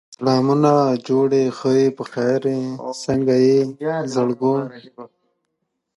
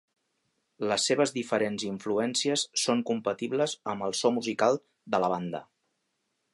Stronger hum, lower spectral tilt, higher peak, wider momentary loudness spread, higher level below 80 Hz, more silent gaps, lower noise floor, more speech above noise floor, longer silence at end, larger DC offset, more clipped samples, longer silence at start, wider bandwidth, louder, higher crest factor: neither; first, -7 dB/octave vs -3.5 dB/octave; first, -2 dBFS vs -10 dBFS; about the same, 9 LU vs 7 LU; first, -58 dBFS vs -74 dBFS; neither; second, -75 dBFS vs -79 dBFS; first, 57 dB vs 50 dB; about the same, 0.9 s vs 0.9 s; neither; neither; second, 0.1 s vs 0.8 s; about the same, 11.5 kHz vs 11.5 kHz; first, -19 LUFS vs -28 LUFS; about the same, 16 dB vs 20 dB